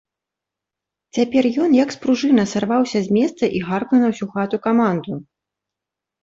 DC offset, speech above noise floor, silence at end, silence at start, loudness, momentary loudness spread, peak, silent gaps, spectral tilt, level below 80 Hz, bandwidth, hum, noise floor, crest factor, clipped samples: under 0.1%; 68 dB; 1 s; 1.15 s; -18 LUFS; 7 LU; -4 dBFS; none; -6 dB/octave; -60 dBFS; 7.8 kHz; none; -85 dBFS; 16 dB; under 0.1%